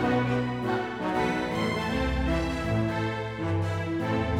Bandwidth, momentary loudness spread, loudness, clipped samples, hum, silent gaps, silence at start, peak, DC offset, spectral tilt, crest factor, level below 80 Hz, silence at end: 14.5 kHz; 3 LU; -28 LUFS; under 0.1%; none; none; 0 s; -12 dBFS; under 0.1%; -7 dB/octave; 14 dB; -38 dBFS; 0 s